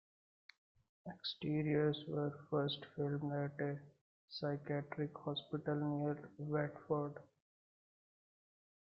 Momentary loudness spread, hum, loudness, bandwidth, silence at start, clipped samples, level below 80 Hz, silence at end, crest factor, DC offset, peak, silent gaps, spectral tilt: 9 LU; none; -41 LUFS; 5.8 kHz; 1.05 s; under 0.1%; -80 dBFS; 1.7 s; 18 dB; under 0.1%; -24 dBFS; 4.01-4.28 s; -5.5 dB/octave